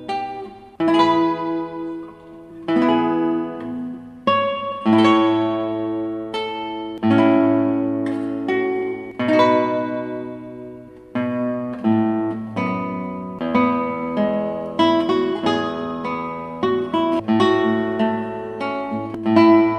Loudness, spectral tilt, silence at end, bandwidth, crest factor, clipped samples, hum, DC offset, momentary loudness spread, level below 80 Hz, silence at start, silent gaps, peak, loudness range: -20 LUFS; -7 dB/octave; 0 s; 8.8 kHz; 18 dB; under 0.1%; none; under 0.1%; 14 LU; -58 dBFS; 0 s; none; -2 dBFS; 3 LU